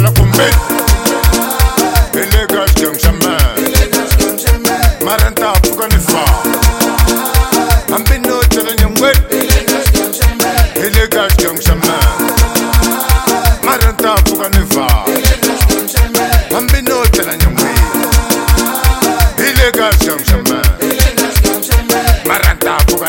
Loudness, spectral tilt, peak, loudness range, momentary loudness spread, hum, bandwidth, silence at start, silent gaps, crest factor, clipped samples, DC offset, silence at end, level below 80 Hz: -11 LUFS; -4 dB/octave; 0 dBFS; 1 LU; 2 LU; none; 17.5 kHz; 0 s; none; 10 dB; 0.2%; under 0.1%; 0 s; -14 dBFS